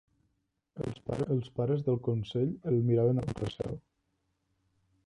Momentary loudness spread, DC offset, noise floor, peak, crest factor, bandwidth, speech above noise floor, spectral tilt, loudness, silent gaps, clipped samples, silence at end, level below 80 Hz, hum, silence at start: 12 LU; under 0.1%; -79 dBFS; -16 dBFS; 16 dB; 10.5 kHz; 48 dB; -9 dB/octave; -32 LUFS; none; under 0.1%; 1.25 s; -58 dBFS; none; 0.75 s